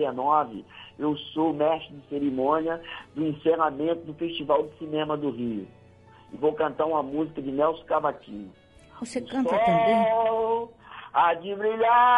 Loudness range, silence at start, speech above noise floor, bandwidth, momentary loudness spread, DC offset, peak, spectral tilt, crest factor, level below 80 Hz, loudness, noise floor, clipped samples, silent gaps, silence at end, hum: 4 LU; 0 s; 27 dB; 11 kHz; 16 LU; under 0.1%; -8 dBFS; -6.5 dB/octave; 16 dB; -62 dBFS; -26 LUFS; -53 dBFS; under 0.1%; none; 0 s; none